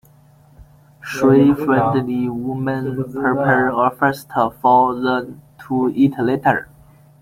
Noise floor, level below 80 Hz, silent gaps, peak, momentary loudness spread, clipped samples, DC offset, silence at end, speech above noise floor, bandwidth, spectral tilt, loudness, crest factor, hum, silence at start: -49 dBFS; -52 dBFS; none; -2 dBFS; 9 LU; under 0.1%; under 0.1%; 0.6 s; 33 dB; 16 kHz; -7.5 dB/octave; -17 LUFS; 16 dB; none; 0.6 s